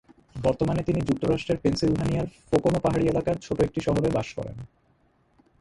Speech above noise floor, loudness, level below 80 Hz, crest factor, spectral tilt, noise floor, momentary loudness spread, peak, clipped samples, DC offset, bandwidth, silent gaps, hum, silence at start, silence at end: 40 dB; -26 LUFS; -44 dBFS; 16 dB; -7 dB/octave; -64 dBFS; 9 LU; -8 dBFS; under 0.1%; under 0.1%; 11.5 kHz; none; none; 0.35 s; 0.95 s